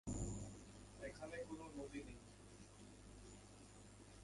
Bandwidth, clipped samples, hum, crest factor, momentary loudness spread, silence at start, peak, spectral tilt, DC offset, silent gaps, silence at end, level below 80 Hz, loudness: 11.5 kHz; under 0.1%; 50 Hz at -65 dBFS; 20 dB; 12 LU; 0.05 s; -32 dBFS; -5 dB/octave; under 0.1%; none; 0 s; -62 dBFS; -55 LUFS